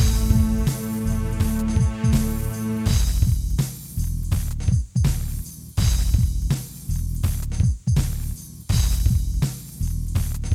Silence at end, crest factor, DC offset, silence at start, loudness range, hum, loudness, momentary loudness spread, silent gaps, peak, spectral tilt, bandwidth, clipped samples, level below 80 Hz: 0 s; 16 dB; under 0.1%; 0 s; 2 LU; none; -23 LUFS; 8 LU; none; -4 dBFS; -6 dB/octave; 16.5 kHz; under 0.1%; -24 dBFS